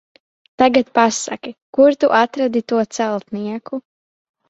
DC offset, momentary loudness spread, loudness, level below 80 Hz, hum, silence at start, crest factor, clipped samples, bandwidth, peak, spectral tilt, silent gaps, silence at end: under 0.1%; 14 LU; -17 LUFS; -60 dBFS; none; 0.6 s; 16 dB; under 0.1%; 8 kHz; -2 dBFS; -4 dB/octave; 1.62-1.73 s; 0.7 s